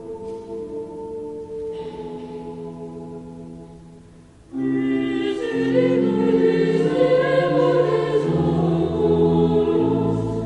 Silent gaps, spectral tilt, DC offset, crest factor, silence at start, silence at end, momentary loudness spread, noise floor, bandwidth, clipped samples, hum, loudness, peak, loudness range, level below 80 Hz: none; -8 dB/octave; under 0.1%; 16 dB; 0 s; 0 s; 17 LU; -46 dBFS; 9.6 kHz; under 0.1%; none; -20 LUFS; -6 dBFS; 15 LU; -46 dBFS